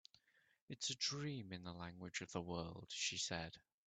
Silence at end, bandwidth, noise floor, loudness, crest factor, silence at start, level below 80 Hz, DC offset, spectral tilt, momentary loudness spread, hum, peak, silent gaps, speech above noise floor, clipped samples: 0.25 s; 9 kHz; -75 dBFS; -45 LUFS; 20 dB; 0.7 s; -74 dBFS; under 0.1%; -3 dB/octave; 11 LU; none; -28 dBFS; none; 28 dB; under 0.1%